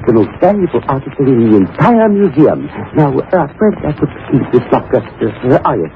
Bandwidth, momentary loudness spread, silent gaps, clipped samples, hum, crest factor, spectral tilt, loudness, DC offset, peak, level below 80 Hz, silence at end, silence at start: 5.4 kHz; 8 LU; none; under 0.1%; none; 12 dB; -10.5 dB/octave; -12 LUFS; under 0.1%; 0 dBFS; -40 dBFS; 0.05 s; 0 s